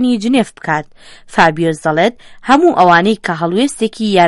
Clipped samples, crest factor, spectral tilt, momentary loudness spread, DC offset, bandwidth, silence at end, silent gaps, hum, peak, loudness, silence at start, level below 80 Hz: under 0.1%; 12 dB; -5.5 dB/octave; 10 LU; under 0.1%; 11.5 kHz; 0 s; none; none; 0 dBFS; -13 LUFS; 0 s; -48 dBFS